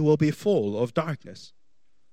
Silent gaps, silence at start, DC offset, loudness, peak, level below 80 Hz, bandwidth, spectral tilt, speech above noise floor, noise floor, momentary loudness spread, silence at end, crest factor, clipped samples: none; 0 s; 0.3%; -25 LUFS; -10 dBFS; -66 dBFS; 15 kHz; -7.5 dB/octave; 51 dB; -75 dBFS; 20 LU; 0.65 s; 16 dB; under 0.1%